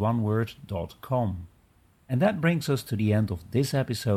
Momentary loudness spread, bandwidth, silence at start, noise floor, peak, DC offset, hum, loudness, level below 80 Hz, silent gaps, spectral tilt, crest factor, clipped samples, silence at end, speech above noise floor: 10 LU; 15.5 kHz; 0 s; -61 dBFS; -12 dBFS; under 0.1%; none; -27 LUFS; -54 dBFS; none; -7 dB/octave; 16 dB; under 0.1%; 0 s; 35 dB